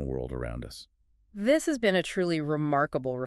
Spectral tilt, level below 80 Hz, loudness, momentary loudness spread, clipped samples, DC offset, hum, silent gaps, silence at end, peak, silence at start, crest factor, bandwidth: -5.5 dB/octave; -48 dBFS; -28 LUFS; 16 LU; under 0.1%; under 0.1%; none; none; 0 s; -10 dBFS; 0 s; 18 dB; 13 kHz